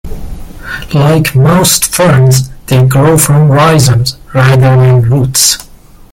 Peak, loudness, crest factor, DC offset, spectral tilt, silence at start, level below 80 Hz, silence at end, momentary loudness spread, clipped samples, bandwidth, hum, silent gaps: 0 dBFS; -7 LUFS; 8 dB; under 0.1%; -5 dB/octave; 0.05 s; -28 dBFS; 0.5 s; 13 LU; 0.2%; 17 kHz; none; none